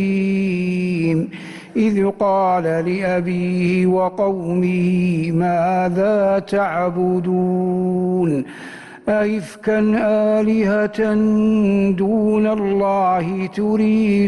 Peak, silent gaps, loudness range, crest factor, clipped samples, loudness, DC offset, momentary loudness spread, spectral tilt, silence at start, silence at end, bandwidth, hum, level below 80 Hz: -8 dBFS; none; 3 LU; 10 dB; under 0.1%; -18 LUFS; under 0.1%; 5 LU; -8.5 dB/octave; 0 s; 0 s; 11.5 kHz; none; -52 dBFS